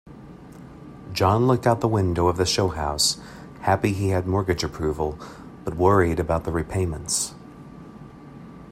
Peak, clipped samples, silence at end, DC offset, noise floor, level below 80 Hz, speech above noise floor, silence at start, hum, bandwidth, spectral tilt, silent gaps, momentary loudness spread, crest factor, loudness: -4 dBFS; under 0.1%; 0 s; under 0.1%; -43 dBFS; -44 dBFS; 21 dB; 0.05 s; none; 16 kHz; -5 dB/octave; none; 23 LU; 20 dB; -23 LUFS